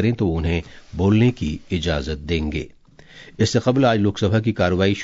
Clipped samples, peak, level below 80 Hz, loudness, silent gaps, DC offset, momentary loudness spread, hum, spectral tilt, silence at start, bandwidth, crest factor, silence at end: under 0.1%; -4 dBFS; -36 dBFS; -20 LUFS; none; under 0.1%; 10 LU; none; -6.5 dB/octave; 0 s; 7.8 kHz; 16 dB; 0 s